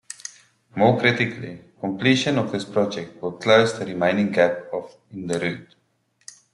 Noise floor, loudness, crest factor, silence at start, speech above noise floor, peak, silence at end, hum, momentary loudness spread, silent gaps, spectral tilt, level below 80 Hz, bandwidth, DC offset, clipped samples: -66 dBFS; -22 LUFS; 20 dB; 0.25 s; 45 dB; -2 dBFS; 0.9 s; none; 18 LU; none; -5 dB/octave; -64 dBFS; 11.5 kHz; under 0.1%; under 0.1%